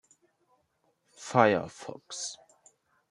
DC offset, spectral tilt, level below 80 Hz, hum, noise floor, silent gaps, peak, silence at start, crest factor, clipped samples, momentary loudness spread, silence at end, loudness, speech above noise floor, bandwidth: under 0.1%; -4.5 dB/octave; -74 dBFS; none; -74 dBFS; none; -6 dBFS; 1.2 s; 28 dB; under 0.1%; 21 LU; 0.75 s; -28 LUFS; 46 dB; 11.5 kHz